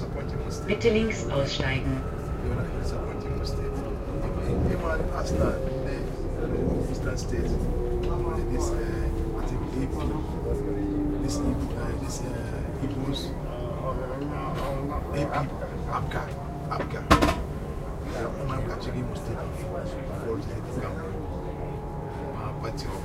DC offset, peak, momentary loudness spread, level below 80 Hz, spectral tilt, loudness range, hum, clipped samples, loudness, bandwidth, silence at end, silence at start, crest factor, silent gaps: under 0.1%; -4 dBFS; 7 LU; -34 dBFS; -6.5 dB/octave; 4 LU; none; under 0.1%; -30 LUFS; 15.5 kHz; 0 s; 0 s; 24 dB; none